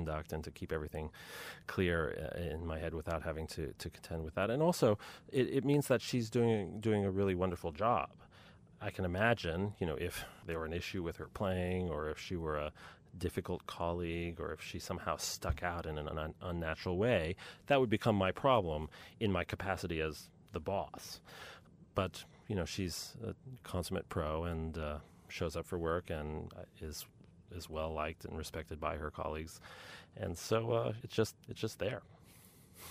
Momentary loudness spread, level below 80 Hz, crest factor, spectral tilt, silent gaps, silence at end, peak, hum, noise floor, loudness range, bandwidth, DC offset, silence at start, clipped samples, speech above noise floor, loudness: 14 LU; -54 dBFS; 22 dB; -5.5 dB/octave; none; 0 s; -16 dBFS; none; -61 dBFS; 8 LU; 15.5 kHz; under 0.1%; 0 s; under 0.1%; 23 dB; -38 LUFS